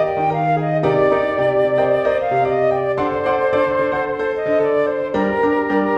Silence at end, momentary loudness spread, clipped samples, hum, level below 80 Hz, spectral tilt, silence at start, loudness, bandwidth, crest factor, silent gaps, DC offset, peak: 0 s; 3 LU; under 0.1%; none; -48 dBFS; -8 dB/octave; 0 s; -18 LUFS; 7.8 kHz; 12 dB; none; under 0.1%; -4 dBFS